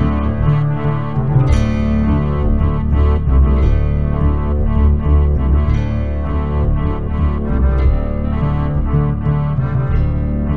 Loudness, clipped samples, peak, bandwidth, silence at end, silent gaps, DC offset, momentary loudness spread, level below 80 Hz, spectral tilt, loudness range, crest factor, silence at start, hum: -16 LUFS; under 0.1%; -2 dBFS; 6.2 kHz; 0 s; none; 5%; 5 LU; -16 dBFS; -9.5 dB/octave; 2 LU; 12 dB; 0 s; none